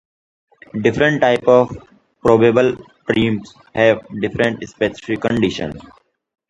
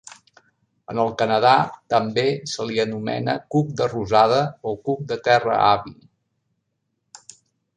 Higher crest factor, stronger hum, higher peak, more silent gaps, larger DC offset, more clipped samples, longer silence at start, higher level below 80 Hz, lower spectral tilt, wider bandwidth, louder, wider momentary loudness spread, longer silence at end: about the same, 18 dB vs 20 dB; neither; about the same, 0 dBFS vs -2 dBFS; neither; neither; neither; second, 0.75 s vs 0.9 s; first, -48 dBFS vs -58 dBFS; about the same, -6.5 dB/octave vs -5.5 dB/octave; about the same, 9.8 kHz vs 10 kHz; first, -17 LUFS vs -21 LUFS; first, 15 LU vs 10 LU; second, 0.7 s vs 1.85 s